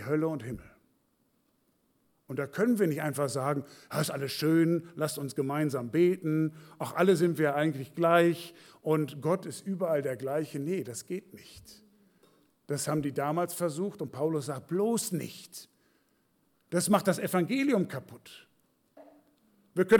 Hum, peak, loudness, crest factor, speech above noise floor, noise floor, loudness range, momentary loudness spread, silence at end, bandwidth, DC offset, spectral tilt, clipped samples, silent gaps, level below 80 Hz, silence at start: none; -12 dBFS; -30 LUFS; 20 dB; 43 dB; -73 dBFS; 7 LU; 14 LU; 0 s; 19 kHz; under 0.1%; -5.5 dB/octave; under 0.1%; none; -70 dBFS; 0 s